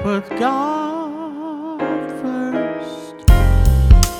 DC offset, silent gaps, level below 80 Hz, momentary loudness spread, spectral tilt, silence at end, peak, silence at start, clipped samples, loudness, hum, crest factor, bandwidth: under 0.1%; none; -18 dBFS; 14 LU; -6 dB/octave; 0 s; 0 dBFS; 0 s; under 0.1%; -19 LUFS; none; 16 dB; 17.5 kHz